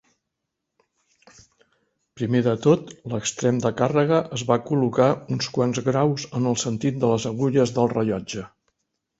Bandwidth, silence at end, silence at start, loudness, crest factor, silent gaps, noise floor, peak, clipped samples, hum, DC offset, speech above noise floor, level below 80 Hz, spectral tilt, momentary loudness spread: 8 kHz; 0.75 s; 2.15 s; -22 LUFS; 20 dB; none; -81 dBFS; -4 dBFS; under 0.1%; none; under 0.1%; 60 dB; -58 dBFS; -6 dB/octave; 7 LU